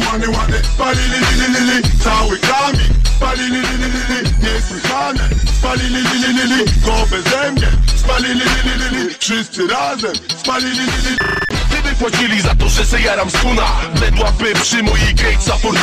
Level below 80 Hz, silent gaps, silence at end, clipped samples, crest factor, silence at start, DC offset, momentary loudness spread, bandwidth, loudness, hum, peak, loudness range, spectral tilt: -16 dBFS; none; 0 s; under 0.1%; 8 dB; 0 s; under 0.1%; 4 LU; 14.5 kHz; -14 LUFS; none; -6 dBFS; 2 LU; -4 dB/octave